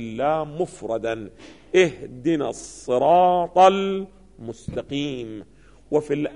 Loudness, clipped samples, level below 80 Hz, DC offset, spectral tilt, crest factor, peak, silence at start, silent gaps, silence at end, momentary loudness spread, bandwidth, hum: -22 LUFS; under 0.1%; -52 dBFS; 0.2%; -5.5 dB/octave; 18 dB; -4 dBFS; 0 s; none; 0 s; 20 LU; 10.5 kHz; none